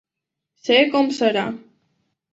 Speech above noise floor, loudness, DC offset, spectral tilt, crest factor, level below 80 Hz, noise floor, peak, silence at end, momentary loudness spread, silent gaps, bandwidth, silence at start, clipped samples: 65 dB; -19 LUFS; under 0.1%; -4 dB/octave; 20 dB; -68 dBFS; -84 dBFS; -2 dBFS; 0.75 s; 15 LU; none; 8 kHz; 0.65 s; under 0.1%